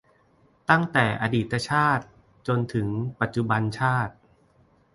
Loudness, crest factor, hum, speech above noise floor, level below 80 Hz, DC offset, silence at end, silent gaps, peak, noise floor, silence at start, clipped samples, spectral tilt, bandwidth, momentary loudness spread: -25 LUFS; 22 dB; none; 37 dB; -54 dBFS; under 0.1%; 0.85 s; none; -4 dBFS; -61 dBFS; 0.7 s; under 0.1%; -6.5 dB/octave; 11.5 kHz; 7 LU